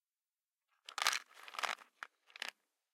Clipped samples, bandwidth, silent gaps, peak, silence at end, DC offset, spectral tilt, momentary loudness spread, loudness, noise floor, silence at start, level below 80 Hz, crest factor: under 0.1%; 16.5 kHz; none; -12 dBFS; 0.45 s; under 0.1%; 4 dB/octave; 18 LU; -40 LUFS; under -90 dBFS; 0.9 s; under -90 dBFS; 32 dB